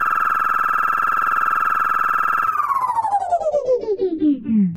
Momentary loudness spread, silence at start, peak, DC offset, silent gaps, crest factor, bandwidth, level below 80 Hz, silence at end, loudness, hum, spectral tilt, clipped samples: 2 LU; 0 s; -8 dBFS; under 0.1%; none; 12 dB; 17 kHz; -54 dBFS; 0 s; -18 LUFS; none; -7 dB/octave; under 0.1%